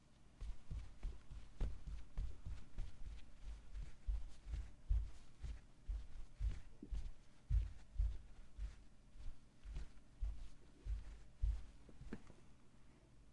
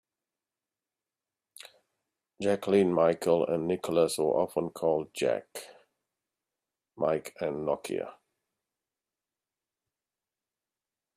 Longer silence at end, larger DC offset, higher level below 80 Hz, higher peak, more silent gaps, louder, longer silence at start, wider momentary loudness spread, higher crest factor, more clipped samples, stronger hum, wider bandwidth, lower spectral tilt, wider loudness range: second, 0 s vs 3.05 s; neither; first, -48 dBFS vs -72 dBFS; second, -26 dBFS vs -12 dBFS; neither; second, -52 LUFS vs -29 LUFS; second, 0 s vs 1.65 s; about the same, 18 LU vs 17 LU; about the same, 20 dB vs 22 dB; neither; neither; second, 9.8 kHz vs 15 kHz; about the same, -6.5 dB/octave vs -5.5 dB/octave; second, 5 LU vs 10 LU